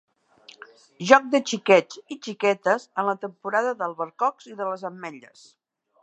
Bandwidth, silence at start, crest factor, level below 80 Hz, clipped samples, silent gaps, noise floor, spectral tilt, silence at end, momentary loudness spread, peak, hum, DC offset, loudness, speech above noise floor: 8.6 kHz; 1 s; 24 dB; -72 dBFS; under 0.1%; none; -53 dBFS; -4 dB/octave; 0.85 s; 17 LU; 0 dBFS; none; under 0.1%; -23 LUFS; 29 dB